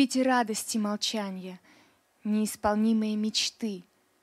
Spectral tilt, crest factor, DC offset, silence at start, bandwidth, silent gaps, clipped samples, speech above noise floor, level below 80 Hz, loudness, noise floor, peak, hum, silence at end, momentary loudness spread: -3.5 dB/octave; 18 dB; under 0.1%; 0 s; 14.5 kHz; none; under 0.1%; 35 dB; -64 dBFS; -28 LUFS; -63 dBFS; -10 dBFS; none; 0.4 s; 13 LU